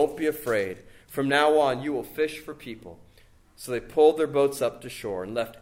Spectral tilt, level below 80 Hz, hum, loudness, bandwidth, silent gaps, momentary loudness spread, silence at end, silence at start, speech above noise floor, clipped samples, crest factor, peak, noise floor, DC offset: -4.5 dB/octave; -56 dBFS; none; -25 LUFS; 16.5 kHz; none; 19 LU; 0.05 s; 0 s; 30 dB; under 0.1%; 18 dB; -8 dBFS; -56 dBFS; under 0.1%